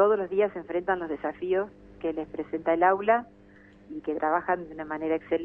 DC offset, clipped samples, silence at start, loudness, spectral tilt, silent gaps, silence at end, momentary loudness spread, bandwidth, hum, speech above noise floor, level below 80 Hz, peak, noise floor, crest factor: under 0.1%; under 0.1%; 0 s; -28 LUFS; -8.5 dB/octave; none; 0 s; 12 LU; 3.7 kHz; 50 Hz at -60 dBFS; 25 dB; -60 dBFS; -10 dBFS; -53 dBFS; 18 dB